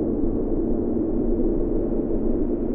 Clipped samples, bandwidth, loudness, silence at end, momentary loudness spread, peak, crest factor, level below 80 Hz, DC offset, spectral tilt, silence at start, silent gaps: under 0.1%; 2 kHz; -24 LUFS; 0 s; 1 LU; -10 dBFS; 12 dB; -28 dBFS; under 0.1%; -14.5 dB/octave; 0 s; none